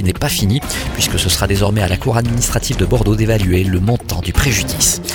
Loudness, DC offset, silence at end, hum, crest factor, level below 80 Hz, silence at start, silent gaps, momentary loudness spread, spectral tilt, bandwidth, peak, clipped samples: -15 LUFS; under 0.1%; 0 s; none; 14 dB; -24 dBFS; 0 s; none; 3 LU; -4 dB/octave; 19.5 kHz; 0 dBFS; under 0.1%